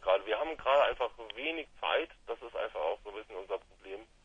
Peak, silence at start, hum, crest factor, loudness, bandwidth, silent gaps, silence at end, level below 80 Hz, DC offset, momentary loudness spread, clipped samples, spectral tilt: -16 dBFS; 0 s; none; 18 dB; -34 LUFS; 7.6 kHz; none; 0.2 s; -60 dBFS; under 0.1%; 17 LU; under 0.1%; -3.5 dB/octave